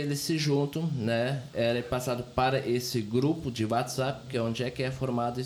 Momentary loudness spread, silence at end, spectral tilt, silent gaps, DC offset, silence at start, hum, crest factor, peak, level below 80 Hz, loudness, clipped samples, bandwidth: 4 LU; 0 s; -5.5 dB/octave; none; under 0.1%; 0 s; none; 16 dB; -12 dBFS; -56 dBFS; -29 LUFS; under 0.1%; 19 kHz